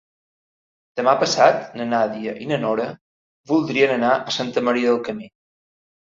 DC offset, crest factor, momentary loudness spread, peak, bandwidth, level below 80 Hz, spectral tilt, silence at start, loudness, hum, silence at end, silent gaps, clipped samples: under 0.1%; 20 dB; 12 LU; -2 dBFS; 7.8 kHz; -66 dBFS; -4.5 dB/octave; 0.95 s; -20 LUFS; none; 0.85 s; 3.01-3.44 s; under 0.1%